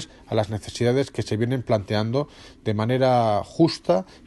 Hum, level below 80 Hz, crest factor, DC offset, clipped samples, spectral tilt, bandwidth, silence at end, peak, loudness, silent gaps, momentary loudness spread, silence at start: none; -52 dBFS; 18 dB; under 0.1%; under 0.1%; -6.5 dB/octave; 12 kHz; 0.25 s; -6 dBFS; -23 LUFS; none; 8 LU; 0 s